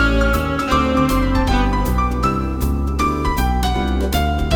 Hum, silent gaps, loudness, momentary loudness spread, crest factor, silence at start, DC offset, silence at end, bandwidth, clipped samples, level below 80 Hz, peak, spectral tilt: none; none; -18 LUFS; 3 LU; 14 dB; 0 s; under 0.1%; 0 s; 18.5 kHz; under 0.1%; -20 dBFS; -2 dBFS; -6 dB/octave